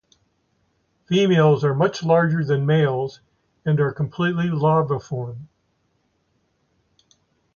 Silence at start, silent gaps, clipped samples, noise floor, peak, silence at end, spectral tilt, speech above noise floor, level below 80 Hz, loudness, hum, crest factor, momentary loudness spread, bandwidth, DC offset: 1.1 s; none; under 0.1%; -68 dBFS; -6 dBFS; 2.1 s; -7.5 dB/octave; 49 dB; -58 dBFS; -20 LUFS; none; 16 dB; 13 LU; 7 kHz; under 0.1%